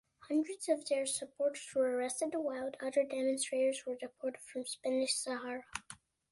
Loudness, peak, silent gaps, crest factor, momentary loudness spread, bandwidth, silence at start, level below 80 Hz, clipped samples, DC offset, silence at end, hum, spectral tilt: -36 LUFS; -20 dBFS; none; 16 dB; 10 LU; 11.5 kHz; 0.2 s; -78 dBFS; under 0.1%; under 0.1%; 0.35 s; none; -1.5 dB/octave